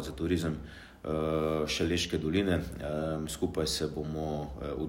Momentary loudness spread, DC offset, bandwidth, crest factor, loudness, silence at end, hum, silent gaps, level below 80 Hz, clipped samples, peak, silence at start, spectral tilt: 7 LU; under 0.1%; 16 kHz; 16 dB; -32 LUFS; 0 s; none; none; -46 dBFS; under 0.1%; -16 dBFS; 0 s; -5 dB/octave